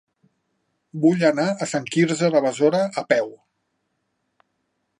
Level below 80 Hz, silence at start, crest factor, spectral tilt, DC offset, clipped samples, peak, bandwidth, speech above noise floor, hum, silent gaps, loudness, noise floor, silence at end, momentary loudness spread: -74 dBFS; 0.95 s; 20 dB; -5.5 dB/octave; under 0.1%; under 0.1%; -4 dBFS; 11 kHz; 54 dB; none; none; -20 LUFS; -74 dBFS; 1.65 s; 6 LU